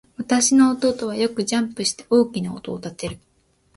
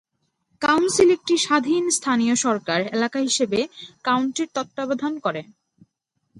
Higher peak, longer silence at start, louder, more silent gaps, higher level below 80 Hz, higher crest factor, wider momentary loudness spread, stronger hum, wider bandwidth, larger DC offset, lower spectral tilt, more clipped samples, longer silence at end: about the same, -4 dBFS vs -4 dBFS; second, 0.2 s vs 0.6 s; about the same, -20 LUFS vs -21 LUFS; neither; first, -56 dBFS vs -64 dBFS; about the same, 18 dB vs 18 dB; first, 15 LU vs 10 LU; neither; about the same, 11.5 kHz vs 11.5 kHz; neither; about the same, -3.5 dB/octave vs -3 dB/octave; neither; second, 0.6 s vs 0.95 s